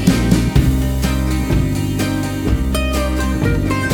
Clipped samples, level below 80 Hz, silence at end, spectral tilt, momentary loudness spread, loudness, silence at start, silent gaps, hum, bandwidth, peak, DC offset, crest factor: under 0.1%; -20 dBFS; 0 s; -6 dB/octave; 4 LU; -17 LUFS; 0 s; none; none; 20 kHz; 0 dBFS; under 0.1%; 16 dB